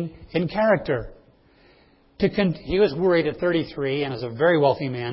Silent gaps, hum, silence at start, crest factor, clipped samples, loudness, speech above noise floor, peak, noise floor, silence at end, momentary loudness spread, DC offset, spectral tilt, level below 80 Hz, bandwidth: none; none; 0 s; 18 dB; under 0.1%; -22 LUFS; 34 dB; -6 dBFS; -56 dBFS; 0 s; 9 LU; under 0.1%; -11 dB/octave; -48 dBFS; 5.8 kHz